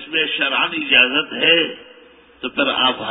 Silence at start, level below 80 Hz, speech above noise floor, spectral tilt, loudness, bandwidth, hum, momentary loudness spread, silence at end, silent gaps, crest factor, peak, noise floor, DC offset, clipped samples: 0 s; -60 dBFS; 29 dB; -7.5 dB/octave; -16 LUFS; 4 kHz; none; 11 LU; 0 s; none; 18 dB; 0 dBFS; -47 dBFS; under 0.1%; under 0.1%